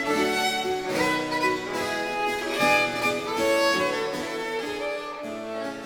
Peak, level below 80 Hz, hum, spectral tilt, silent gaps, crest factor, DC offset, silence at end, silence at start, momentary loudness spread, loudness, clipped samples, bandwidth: -8 dBFS; -58 dBFS; none; -3 dB/octave; none; 18 dB; under 0.1%; 0 s; 0 s; 10 LU; -25 LUFS; under 0.1%; over 20 kHz